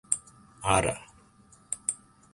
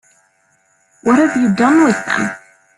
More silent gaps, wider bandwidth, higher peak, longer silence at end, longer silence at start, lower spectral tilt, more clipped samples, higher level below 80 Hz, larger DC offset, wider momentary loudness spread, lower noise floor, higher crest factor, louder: neither; about the same, 11.5 kHz vs 11.5 kHz; second, -8 dBFS vs 0 dBFS; about the same, 0.4 s vs 0.4 s; second, 0.1 s vs 1.05 s; second, -3 dB/octave vs -5.5 dB/octave; neither; first, -50 dBFS vs -56 dBFS; neither; first, 14 LU vs 11 LU; about the same, -58 dBFS vs -58 dBFS; first, 24 dB vs 14 dB; second, -29 LUFS vs -14 LUFS